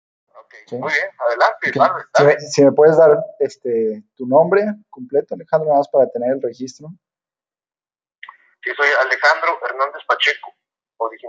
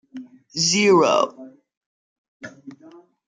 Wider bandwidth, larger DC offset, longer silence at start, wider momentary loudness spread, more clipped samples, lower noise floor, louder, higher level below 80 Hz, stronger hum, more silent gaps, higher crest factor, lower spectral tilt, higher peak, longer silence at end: second, 7.8 kHz vs 9.6 kHz; neither; first, 0.7 s vs 0.15 s; second, 14 LU vs 25 LU; neither; first, under -90 dBFS vs -49 dBFS; about the same, -16 LUFS vs -18 LUFS; about the same, -74 dBFS vs -70 dBFS; neither; second, none vs 1.77-2.40 s; about the same, 16 dB vs 20 dB; first, -4.5 dB/octave vs -3 dB/octave; first, 0 dBFS vs -4 dBFS; second, 0 s vs 0.55 s